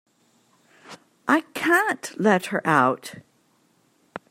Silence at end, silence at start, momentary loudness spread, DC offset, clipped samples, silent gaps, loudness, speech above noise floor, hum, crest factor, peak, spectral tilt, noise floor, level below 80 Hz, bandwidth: 0.1 s; 0.9 s; 18 LU; under 0.1%; under 0.1%; none; -22 LUFS; 42 dB; none; 22 dB; -4 dBFS; -5 dB/octave; -64 dBFS; -72 dBFS; 16 kHz